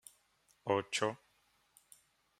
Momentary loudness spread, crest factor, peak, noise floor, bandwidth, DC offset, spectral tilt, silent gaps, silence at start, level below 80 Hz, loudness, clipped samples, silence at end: 21 LU; 24 dB; -16 dBFS; -74 dBFS; 16 kHz; under 0.1%; -3.5 dB/octave; none; 0.65 s; -82 dBFS; -37 LUFS; under 0.1%; 1.25 s